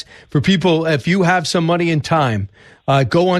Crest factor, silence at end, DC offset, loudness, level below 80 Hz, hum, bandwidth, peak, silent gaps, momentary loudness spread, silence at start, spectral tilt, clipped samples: 12 dB; 0 s; under 0.1%; -16 LUFS; -48 dBFS; none; 12.5 kHz; -4 dBFS; none; 8 LU; 0.35 s; -6 dB/octave; under 0.1%